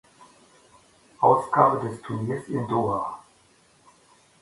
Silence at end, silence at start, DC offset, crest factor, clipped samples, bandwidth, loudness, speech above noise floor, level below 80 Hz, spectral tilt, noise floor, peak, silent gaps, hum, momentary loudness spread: 1.2 s; 1.2 s; under 0.1%; 24 dB; under 0.1%; 11.5 kHz; -24 LUFS; 36 dB; -62 dBFS; -8 dB/octave; -59 dBFS; -2 dBFS; none; none; 12 LU